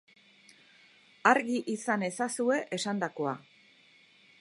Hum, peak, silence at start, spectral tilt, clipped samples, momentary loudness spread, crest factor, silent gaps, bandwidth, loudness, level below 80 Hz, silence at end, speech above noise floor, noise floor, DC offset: none; -6 dBFS; 1.25 s; -4 dB/octave; under 0.1%; 9 LU; 26 dB; none; 11.5 kHz; -30 LUFS; -84 dBFS; 1 s; 32 dB; -61 dBFS; under 0.1%